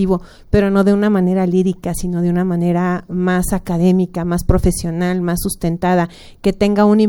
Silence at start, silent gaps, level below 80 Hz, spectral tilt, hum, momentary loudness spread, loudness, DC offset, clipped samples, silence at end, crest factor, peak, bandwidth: 0 s; none; -28 dBFS; -7 dB/octave; none; 6 LU; -16 LUFS; under 0.1%; under 0.1%; 0 s; 16 dB; 0 dBFS; 18 kHz